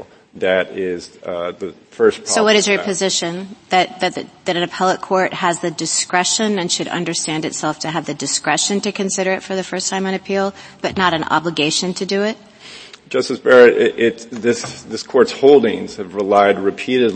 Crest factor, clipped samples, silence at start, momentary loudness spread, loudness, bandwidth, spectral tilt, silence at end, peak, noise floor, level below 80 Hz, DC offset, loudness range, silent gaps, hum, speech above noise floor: 18 dB; under 0.1%; 0 s; 12 LU; -17 LUFS; 8.8 kHz; -3 dB/octave; 0 s; 0 dBFS; -38 dBFS; -60 dBFS; under 0.1%; 5 LU; none; none; 21 dB